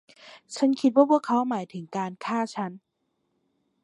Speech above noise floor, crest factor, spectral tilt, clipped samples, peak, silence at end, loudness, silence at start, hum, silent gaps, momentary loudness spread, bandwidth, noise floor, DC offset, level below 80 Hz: 51 dB; 22 dB; -6 dB/octave; under 0.1%; -6 dBFS; 1.05 s; -25 LUFS; 0.25 s; none; none; 13 LU; 11 kHz; -76 dBFS; under 0.1%; -82 dBFS